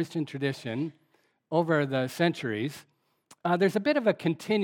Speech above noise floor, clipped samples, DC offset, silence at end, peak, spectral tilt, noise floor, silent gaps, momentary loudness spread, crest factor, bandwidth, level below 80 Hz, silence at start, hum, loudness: 34 dB; under 0.1%; under 0.1%; 0 s; -10 dBFS; -6.5 dB/octave; -61 dBFS; none; 9 LU; 20 dB; 17.5 kHz; -80 dBFS; 0 s; none; -28 LUFS